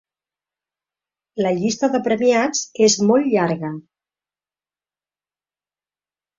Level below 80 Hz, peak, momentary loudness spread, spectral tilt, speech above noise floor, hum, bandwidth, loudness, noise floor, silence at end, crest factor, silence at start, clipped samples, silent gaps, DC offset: -64 dBFS; -4 dBFS; 12 LU; -4 dB/octave; over 72 dB; 50 Hz at -50 dBFS; 7.8 kHz; -18 LUFS; under -90 dBFS; 2.6 s; 18 dB; 1.35 s; under 0.1%; none; under 0.1%